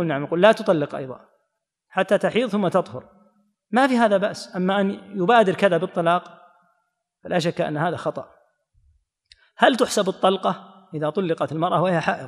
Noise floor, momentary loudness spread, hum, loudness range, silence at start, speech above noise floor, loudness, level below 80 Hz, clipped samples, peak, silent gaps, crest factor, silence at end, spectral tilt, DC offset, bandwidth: -76 dBFS; 12 LU; none; 5 LU; 0 s; 56 dB; -21 LUFS; -70 dBFS; under 0.1%; 0 dBFS; none; 22 dB; 0 s; -5.5 dB/octave; under 0.1%; 14.5 kHz